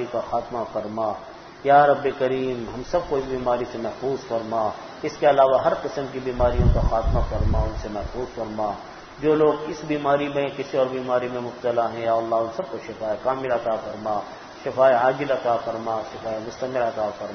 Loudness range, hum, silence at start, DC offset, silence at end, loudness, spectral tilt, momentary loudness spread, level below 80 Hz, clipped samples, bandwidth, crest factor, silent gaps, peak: 3 LU; none; 0 s; under 0.1%; 0 s; -24 LUFS; -7 dB/octave; 12 LU; -34 dBFS; under 0.1%; 6.6 kHz; 18 dB; none; -4 dBFS